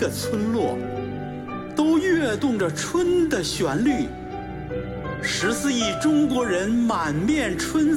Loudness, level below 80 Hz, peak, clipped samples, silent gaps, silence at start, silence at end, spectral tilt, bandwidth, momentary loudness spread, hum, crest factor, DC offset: -23 LUFS; -44 dBFS; -10 dBFS; under 0.1%; none; 0 s; 0 s; -4.5 dB/octave; 16.5 kHz; 11 LU; none; 14 dB; under 0.1%